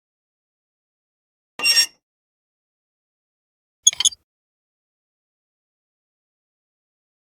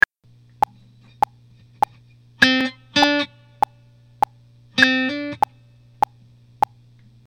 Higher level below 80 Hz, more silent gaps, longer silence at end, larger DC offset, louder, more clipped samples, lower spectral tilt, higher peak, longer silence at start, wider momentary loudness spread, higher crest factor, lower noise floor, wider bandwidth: second, -76 dBFS vs -58 dBFS; first, 2.02-3.83 s vs none; first, 3.15 s vs 1.9 s; neither; first, -17 LUFS vs -21 LUFS; neither; second, 4 dB/octave vs -3 dB/octave; about the same, 0 dBFS vs 0 dBFS; second, 1.6 s vs 2.4 s; second, 6 LU vs 10 LU; about the same, 28 dB vs 24 dB; first, under -90 dBFS vs -53 dBFS; about the same, 17 kHz vs 18 kHz